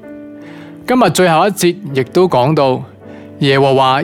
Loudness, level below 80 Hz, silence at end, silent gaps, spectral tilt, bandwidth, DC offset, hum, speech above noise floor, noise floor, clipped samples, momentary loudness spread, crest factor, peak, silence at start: -12 LUFS; -52 dBFS; 0 s; none; -5.5 dB/octave; 17.5 kHz; under 0.1%; none; 21 dB; -32 dBFS; under 0.1%; 22 LU; 12 dB; 0 dBFS; 0.05 s